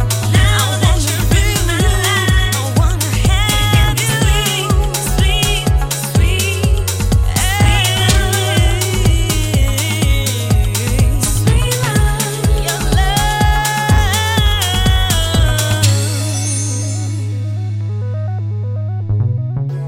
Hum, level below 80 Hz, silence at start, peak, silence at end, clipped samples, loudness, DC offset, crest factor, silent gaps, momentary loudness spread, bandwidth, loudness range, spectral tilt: none; -18 dBFS; 0 s; 0 dBFS; 0 s; under 0.1%; -14 LUFS; under 0.1%; 14 dB; none; 7 LU; 17 kHz; 3 LU; -4 dB/octave